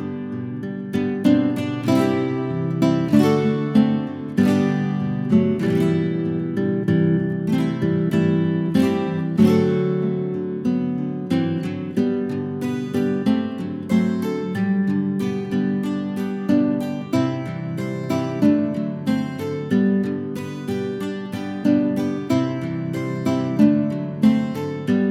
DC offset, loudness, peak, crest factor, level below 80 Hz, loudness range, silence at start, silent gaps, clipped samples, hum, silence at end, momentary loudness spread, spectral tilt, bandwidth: under 0.1%; -21 LUFS; -4 dBFS; 18 dB; -60 dBFS; 4 LU; 0 s; none; under 0.1%; none; 0 s; 8 LU; -8 dB/octave; 14.5 kHz